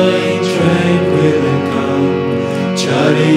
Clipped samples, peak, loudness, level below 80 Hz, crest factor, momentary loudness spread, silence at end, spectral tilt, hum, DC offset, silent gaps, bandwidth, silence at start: under 0.1%; 0 dBFS; -13 LUFS; -52 dBFS; 12 dB; 4 LU; 0 s; -6 dB/octave; none; under 0.1%; none; 14 kHz; 0 s